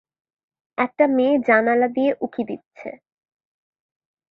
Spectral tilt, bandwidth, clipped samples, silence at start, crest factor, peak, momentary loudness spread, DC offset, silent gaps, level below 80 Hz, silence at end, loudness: -7.5 dB/octave; 5.2 kHz; under 0.1%; 0.8 s; 20 dB; -2 dBFS; 19 LU; under 0.1%; 2.66-2.71 s; -68 dBFS; 1.35 s; -20 LUFS